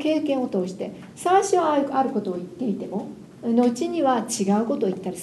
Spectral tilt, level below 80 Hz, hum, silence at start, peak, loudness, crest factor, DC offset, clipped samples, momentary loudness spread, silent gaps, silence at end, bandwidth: -5.5 dB/octave; -66 dBFS; none; 0 s; -6 dBFS; -23 LUFS; 16 dB; under 0.1%; under 0.1%; 11 LU; none; 0 s; 12.5 kHz